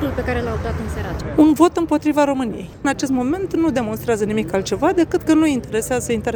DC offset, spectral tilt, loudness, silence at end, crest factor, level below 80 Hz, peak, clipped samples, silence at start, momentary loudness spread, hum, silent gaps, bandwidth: under 0.1%; -5.5 dB/octave; -19 LUFS; 0 s; 18 dB; -36 dBFS; 0 dBFS; under 0.1%; 0 s; 8 LU; none; none; over 20 kHz